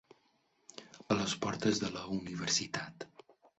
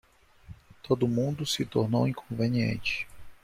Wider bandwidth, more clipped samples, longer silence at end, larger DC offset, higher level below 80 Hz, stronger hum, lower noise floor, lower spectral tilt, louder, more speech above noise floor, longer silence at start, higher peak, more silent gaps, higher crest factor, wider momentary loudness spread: second, 8.2 kHz vs 15.5 kHz; neither; first, 0.55 s vs 0.1 s; neither; second, -66 dBFS vs -56 dBFS; neither; first, -74 dBFS vs -51 dBFS; second, -3.5 dB/octave vs -6 dB/octave; second, -35 LUFS vs -29 LUFS; first, 38 dB vs 23 dB; first, 0.75 s vs 0.5 s; second, -16 dBFS vs -10 dBFS; neither; about the same, 22 dB vs 20 dB; first, 19 LU vs 6 LU